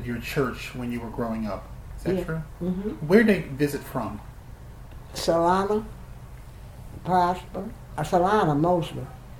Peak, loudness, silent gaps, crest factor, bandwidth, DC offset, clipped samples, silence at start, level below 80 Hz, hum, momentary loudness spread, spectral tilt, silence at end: -4 dBFS; -25 LUFS; none; 22 dB; 17.5 kHz; under 0.1%; under 0.1%; 0 s; -44 dBFS; none; 23 LU; -6.5 dB/octave; 0 s